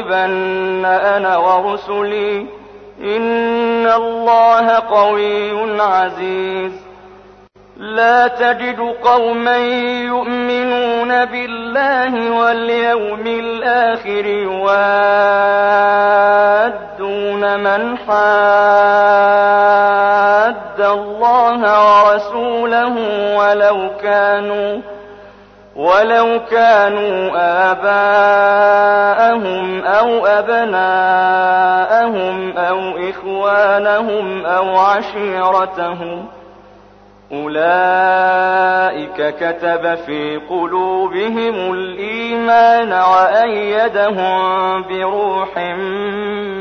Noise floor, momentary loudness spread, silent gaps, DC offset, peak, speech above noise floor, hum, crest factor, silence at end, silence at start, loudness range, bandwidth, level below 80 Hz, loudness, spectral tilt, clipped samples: -43 dBFS; 10 LU; none; under 0.1%; -2 dBFS; 30 dB; 50 Hz at -50 dBFS; 12 dB; 0 s; 0 s; 5 LU; 6.6 kHz; -54 dBFS; -13 LUFS; -5.5 dB/octave; under 0.1%